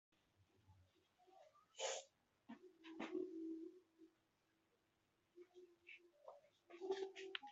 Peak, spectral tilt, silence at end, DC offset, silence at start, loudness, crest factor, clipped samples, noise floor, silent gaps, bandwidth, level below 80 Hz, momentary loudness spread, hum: -24 dBFS; -1.5 dB/octave; 0 s; under 0.1%; 0.4 s; -52 LUFS; 30 dB; under 0.1%; -84 dBFS; none; 8 kHz; under -90 dBFS; 19 LU; none